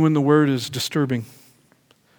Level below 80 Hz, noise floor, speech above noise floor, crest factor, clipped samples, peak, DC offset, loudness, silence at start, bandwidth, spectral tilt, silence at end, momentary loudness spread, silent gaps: -66 dBFS; -59 dBFS; 39 dB; 18 dB; under 0.1%; -4 dBFS; under 0.1%; -20 LUFS; 0 s; over 20 kHz; -6 dB/octave; 0.95 s; 11 LU; none